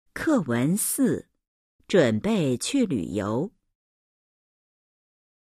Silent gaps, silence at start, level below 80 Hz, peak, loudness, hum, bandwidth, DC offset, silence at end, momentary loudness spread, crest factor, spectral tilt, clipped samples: 1.48-1.79 s; 0.15 s; -58 dBFS; -6 dBFS; -24 LUFS; none; 15.5 kHz; under 0.1%; 2 s; 7 LU; 20 dB; -5 dB/octave; under 0.1%